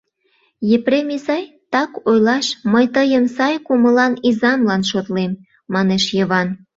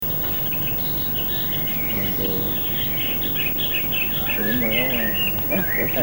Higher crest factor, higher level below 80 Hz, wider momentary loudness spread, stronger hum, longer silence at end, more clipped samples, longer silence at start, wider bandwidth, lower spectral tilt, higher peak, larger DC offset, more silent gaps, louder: about the same, 14 dB vs 14 dB; second, -58 dBFS vs -40 dBFS; first, 8 LU vs 2 LU; neither; first, 0.2 s vs 0 s; neither; first, 0.6 s vs 0 s; second, 7.8 kHz vs 19 kHz; about the same, -5 dB/octave vs -4.5 dB/octave; first, -2 dBFS vs -8 dBFS; second, under 0.1% vs 0.8%; neither; about the same, -17 LUFS vs -19 LUFS